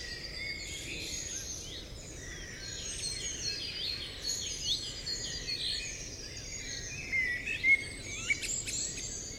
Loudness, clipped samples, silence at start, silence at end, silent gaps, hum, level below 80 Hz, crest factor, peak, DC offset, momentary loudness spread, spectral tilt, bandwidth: -34 LUFS; under 0.1%; 0 s; 0 s; none; none; -50 dBFS; 20 dB; -18 dBFS; under 0.1%; 11 LU; -0.5 dB/octave; 16 kHz